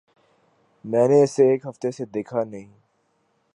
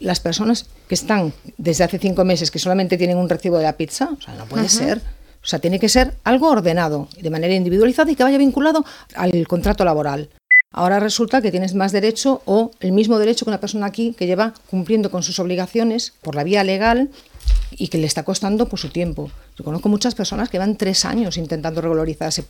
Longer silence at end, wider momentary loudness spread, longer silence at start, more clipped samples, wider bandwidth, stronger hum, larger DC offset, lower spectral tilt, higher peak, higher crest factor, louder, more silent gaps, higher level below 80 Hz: first, 0.9 s vs 0.05 s; first, 16 LU vs 10 LU; first, 0.85 s vs 0 s; neither; second, 11 kHz vs 18 kHz; neither; neither; first, -7 dB/octave vs -4.5 dB/octave; second, -6 dBFS vs 0 dBFS; about the same, 18 dB vs 18 dB; second, -21 LUFS vs -18 LUFS; neither; second, -72 dBFS vs -34 dBFS